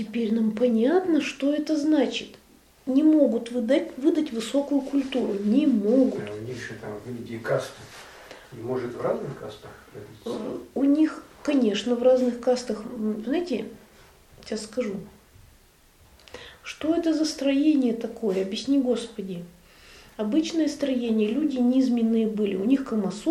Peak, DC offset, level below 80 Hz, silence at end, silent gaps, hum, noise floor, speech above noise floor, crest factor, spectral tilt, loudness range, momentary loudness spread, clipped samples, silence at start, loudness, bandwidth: -8 dBFS; under 0.1%; -60 dBFS; 0 s; none; none; -56 dBFS; 32 dB; 16 dB; -6 dB/octave; 9 LU; 17 LU; under 0.1%; 0 s; -25 LUFS; 13.5 kHz